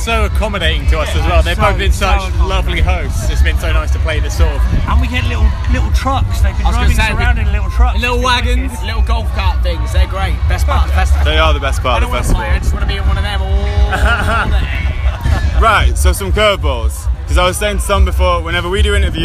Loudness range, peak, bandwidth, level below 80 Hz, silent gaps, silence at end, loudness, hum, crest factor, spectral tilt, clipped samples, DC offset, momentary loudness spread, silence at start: 2 LU; 0 dBFS; 14 kHz; -14 dBFS; none; 0 s; -14 LUFS; none; 12 dB; -5 dB/octave; under 0.1%; under 0.1%; 4 LU; 0 s